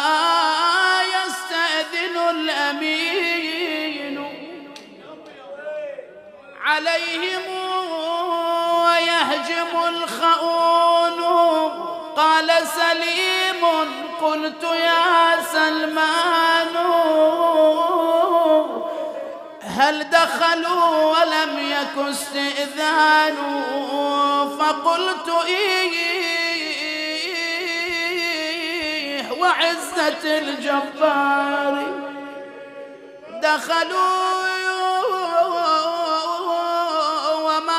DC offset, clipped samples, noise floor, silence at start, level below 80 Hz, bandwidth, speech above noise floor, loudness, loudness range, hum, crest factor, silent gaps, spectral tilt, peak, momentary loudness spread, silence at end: under 0.1%; under 0.1%; -42 dBFS; 0 s; -70 dBFS; 15.5 kHz; 23 dB; -19 LUFS; 6 LU; none; 18 dB; none; -1.5 dB/octave; -2 dBFS; 11 LU; 0 s